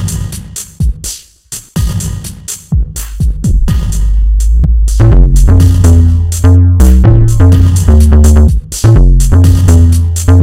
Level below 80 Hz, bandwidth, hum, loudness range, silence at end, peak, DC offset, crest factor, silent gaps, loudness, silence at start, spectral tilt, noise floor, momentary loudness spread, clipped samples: -10 dBFS; 15.5 kHz; none; 9 LU; 0 s; 0 dBFS; under 0.1%; 6 dB; none; -8 LUFS; 0 s; -6.5 dB/octave; -28 dBFS; 14 LU; 2%